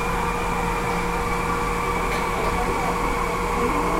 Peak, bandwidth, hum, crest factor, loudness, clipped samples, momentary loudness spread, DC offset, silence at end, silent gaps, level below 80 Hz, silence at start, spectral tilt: -10 dBFS; 16.5 kHz; none; 12 dB; -23 LUFS; under 0.1%; 1 LU; under 0.1%; 0 s; none; -32 dBFS; 0 s; -5 dB/octave